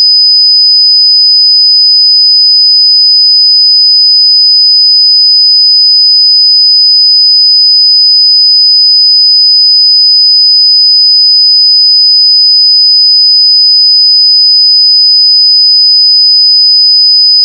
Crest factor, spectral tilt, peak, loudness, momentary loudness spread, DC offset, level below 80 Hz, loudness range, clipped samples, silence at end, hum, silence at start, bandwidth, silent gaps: 4 dB; 8 dB/octave; 0 dBFS; 0 LUFS; 0 LU; under 0.1%; under -90 dBFS; 0 LU; under 0.1%; 0 s; none; 0 s; 5.4 kHz; none